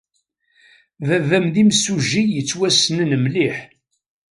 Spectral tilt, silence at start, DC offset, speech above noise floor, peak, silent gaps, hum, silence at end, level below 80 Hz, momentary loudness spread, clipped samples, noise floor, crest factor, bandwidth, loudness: -4 dB/octave; 1 s; under 0.1%; 51 dB; -2 dBFS; none; none; 0.65 s; -60 dBFS; 6 LU; under 0.1%; -68 dBFS; 18 dB; 11.5 kHz; -17 LUFS